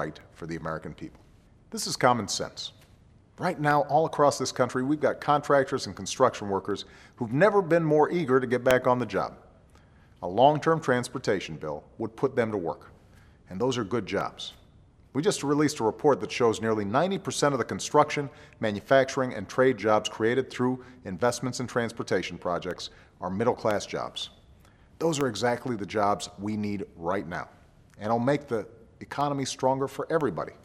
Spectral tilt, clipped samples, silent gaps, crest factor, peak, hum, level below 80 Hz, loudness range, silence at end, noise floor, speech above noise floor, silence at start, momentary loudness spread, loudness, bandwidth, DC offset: -5 dB/octave; under 0.1%; none; 22 dB; -6 dBFS; none; -60 dBFS; 6 LU; 0.1 s; -57 dBFS; 30 dB; 0 s; 14 LU; -27 LUFS; 14.5 kHz; under 0.1%